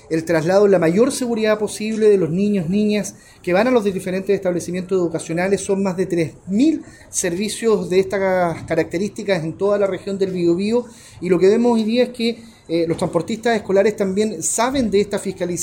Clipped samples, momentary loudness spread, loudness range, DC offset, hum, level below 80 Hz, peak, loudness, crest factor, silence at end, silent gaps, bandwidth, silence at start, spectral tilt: under 0.1%; 8 LU; 2 LU; under 0.1%; none; -50 dBFS; -4 dBFS; -19 LUFS; 14 dB; 0 s; none; 17 kHz; 0.1 s; -5 dB/octave